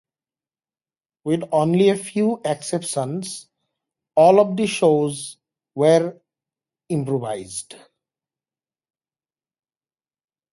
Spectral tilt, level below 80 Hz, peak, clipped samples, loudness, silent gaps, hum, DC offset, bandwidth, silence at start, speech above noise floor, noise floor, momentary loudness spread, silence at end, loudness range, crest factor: -5.5 dB/octave; -66 dBFS; -2 dBFS; under 0.1%; -20 LUFS; none; none; under 0.1%; 11.5 kHz; 1.25 s; over 71 dB; under -90 dBFS; 16 LU; 2.8 s; 12 LU; 20 dB